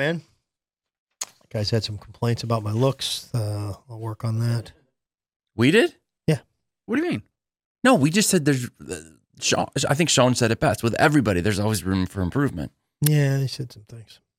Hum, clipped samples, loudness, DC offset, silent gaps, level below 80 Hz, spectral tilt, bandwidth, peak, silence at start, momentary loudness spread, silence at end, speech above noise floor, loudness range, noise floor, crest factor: none; under 0.1%; -22 LUFS; under 0.1%; 0.99-1.07 s, 5.36-5.40 s, 7.65-7.75 s; -54 dBFS; -5 dB/octave; 16.5 kHz; -4 dBFS; 0 s; 16 LU; 0.35 s; 66 dB; 6 LU; -88 dBFS; 20 dB